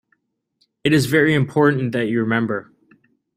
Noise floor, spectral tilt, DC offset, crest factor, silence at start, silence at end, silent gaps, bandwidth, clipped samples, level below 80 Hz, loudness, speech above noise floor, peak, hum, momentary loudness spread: -68 dBFS; -6.5 dB/octave; under 0.1%; 18 dB; 0.85 s; 0.75 s; none; 16 kHz; under 0.1%; -56 dBFS; -18 LUFS; 50 dB; -2 dBFS; none; 9 LU